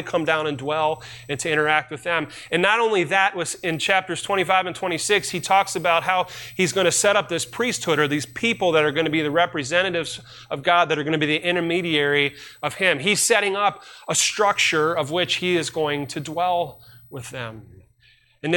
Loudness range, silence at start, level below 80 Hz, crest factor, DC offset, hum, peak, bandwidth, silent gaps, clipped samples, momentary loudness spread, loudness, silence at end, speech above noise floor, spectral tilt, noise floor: 2 LU; 0 s; -60 dBFS; 18 dB; under 0.1%; none; -4 dBFS; 17 kHz; none; under 0.1%; 11 LU; -21 LUFS; 0 s; 36 dB; -3 dB/octave; -58 dBFS